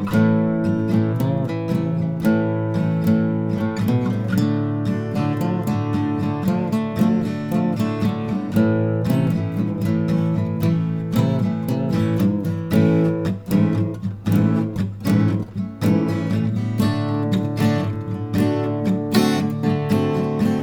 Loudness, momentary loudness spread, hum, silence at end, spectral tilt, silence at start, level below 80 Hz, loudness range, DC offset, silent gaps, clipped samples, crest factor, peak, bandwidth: -21 LUFS; 4 LU; none; 0 s; -8 dB/octave; 0 s; -48 dBFS; 1 LU; under 0.1%; none; under 0.1%; 16 dB; -4 dBFS; 19.5 kHz